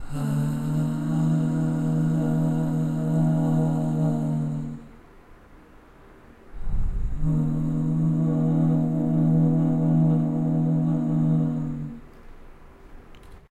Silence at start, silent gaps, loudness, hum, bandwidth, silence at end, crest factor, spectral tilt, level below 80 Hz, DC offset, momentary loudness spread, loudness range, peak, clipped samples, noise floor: 0 s; none; -24 LUFS; none; 8.8 kHz; 0.15 s; 12 dB; -9.5 dB/octave; -36 dBFS; under 0.1%; 10 LU; 8 LU; -12 dBFS; under 0.1%; -49 dBFS